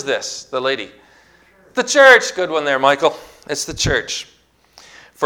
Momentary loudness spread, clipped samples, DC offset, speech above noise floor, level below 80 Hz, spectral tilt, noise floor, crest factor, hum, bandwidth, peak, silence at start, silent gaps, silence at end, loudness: 17 LU; 0.2%; under 0.1%; 35 dB; -44 dBFS; -2.5 dB/octave; -51 dBFS; 18 dB; none; 18 kHz; 0 dBFS; 0 s; none; 0 s; -16 LUFS